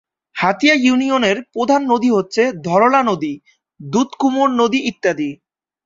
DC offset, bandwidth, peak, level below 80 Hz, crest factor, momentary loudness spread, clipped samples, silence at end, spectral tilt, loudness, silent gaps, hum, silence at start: under 0.1%; 7.6 kHz; -2 dBFS; -60 dBFS; 16 dB; 10 LU; under 0.1%; 0.5 s; -4.5 dB/octave; -16 LUFS; none; none; 0.35 s